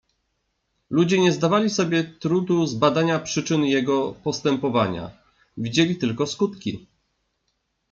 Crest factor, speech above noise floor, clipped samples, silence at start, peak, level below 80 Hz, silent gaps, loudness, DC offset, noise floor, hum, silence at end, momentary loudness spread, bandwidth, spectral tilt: 18 dB; 52 dB; under 0.1%; 0.9 s; -4 dBFS; -60 dBFS; none; -22 LUFS; under 0.1%; -74 dBFS; none; 1.15 s; 8 LU; 7.8 kHz; -5.5 dB/octave